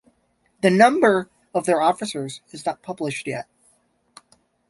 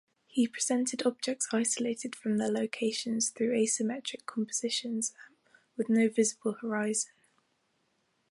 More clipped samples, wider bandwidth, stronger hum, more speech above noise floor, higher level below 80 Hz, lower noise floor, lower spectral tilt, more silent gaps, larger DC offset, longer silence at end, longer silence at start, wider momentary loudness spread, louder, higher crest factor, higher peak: neither; about the same, 11.5 kHz vs 11.5 kHz; neither; about the same, 46 dB vs 44 dB; first, -66 dBFS vs -82 dBFS; second, -66 dBFS vs -75 dBFS; first, -5 dB/octave vs -3 dB/octave; neither; neither; about the same, 1.3 s vs 1.25 s; first, 0.65 s vs 0.35 s; first, 16 LU vs 8 LU; first, -21 LUFS vs -31 LUFS; about the same, 22 dB vs 18 dB; first, -2 dBFS vs -14 dBFS